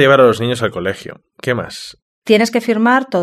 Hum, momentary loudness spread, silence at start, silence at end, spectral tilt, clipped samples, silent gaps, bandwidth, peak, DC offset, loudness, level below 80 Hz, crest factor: none; 19 LU; 0 s; 0 s; -5.5 dB/octave; under 0.1%; 2.02-2.22 s; 13.5 kHz; 0 dBFS; under 0.1%; -15 LUFS; -54 dBFS; 14 dB